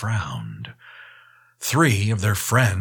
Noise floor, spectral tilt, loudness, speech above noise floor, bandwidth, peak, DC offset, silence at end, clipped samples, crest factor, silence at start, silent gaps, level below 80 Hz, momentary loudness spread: -52 dBFS; -5 dB/octave; -21 LUFS; 32 dB; 19 kHz; -4 dBFS; under 0.1%; 0 s; under 0.1%; 20 dB; 0 s; none; -52 dBFS; 18 LU